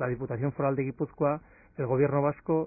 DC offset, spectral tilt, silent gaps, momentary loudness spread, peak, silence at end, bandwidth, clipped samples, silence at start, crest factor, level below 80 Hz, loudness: under 0.1%; -15 dB/octave; none; 10 LU; -12 dBFS; 0 s; 2.7 kHz; under 0.1%; 0 s; 16 dB; -58 dBFS; -29 LUFS